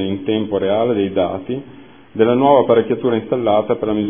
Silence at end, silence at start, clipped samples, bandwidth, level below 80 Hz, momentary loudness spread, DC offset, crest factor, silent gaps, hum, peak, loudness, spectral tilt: 0 s; 0 s; under 0.1%; 3.6 kHz; -54 dBFS; 11 LU; 0.4%; 16 dB; none; none; 0 dBFS; -16 LUFS; -11 dB/octave